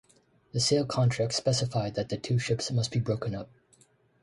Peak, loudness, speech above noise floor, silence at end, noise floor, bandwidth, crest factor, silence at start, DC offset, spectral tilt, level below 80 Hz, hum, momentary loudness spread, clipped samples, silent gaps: -14 dBFS; -29 LUFS; 36 dB; 0.75 s; -64 dBFS; 11.5 kHz; 16 dB; 0.55 s; under 0.1%; -5 dB/octave; -58 dBFS; none; 10 LU; under 0.1%; none